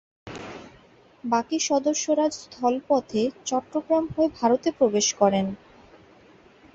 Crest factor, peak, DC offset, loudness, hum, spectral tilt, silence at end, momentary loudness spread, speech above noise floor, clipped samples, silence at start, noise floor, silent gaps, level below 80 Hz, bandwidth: 20 dB; -6 dBFS; under 0.1%; -24 LUFS; none; -4 dB/octave; 1.2 s; 17 LU; 31 dB; under 0.1%; 0.25 s; -54 dBFS; none; -60 dBFS; 8.2 kHz